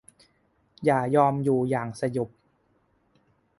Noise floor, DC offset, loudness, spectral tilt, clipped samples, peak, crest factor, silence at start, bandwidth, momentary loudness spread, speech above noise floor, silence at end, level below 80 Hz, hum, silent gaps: -68 dBFS; under 0.1%; -25 LUFS; -8 dB/octave; under 0.1%; -6 dBFS; 20 dB; 0.8 s; 11.5 kHz; 9 LU; 44 dB; 1.3 s; -64 dBFS; none; none